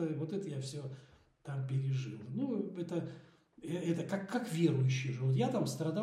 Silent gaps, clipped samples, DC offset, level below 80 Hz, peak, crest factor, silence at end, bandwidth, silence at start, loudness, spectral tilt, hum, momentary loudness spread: none; under 0.1%; under 0.1%; -78 dBFS; -18 dBFS; 18 dB; 0 s; 13.5 kHz; 0 s; -36 LUFS; -7 dB/octave; none; 14 LU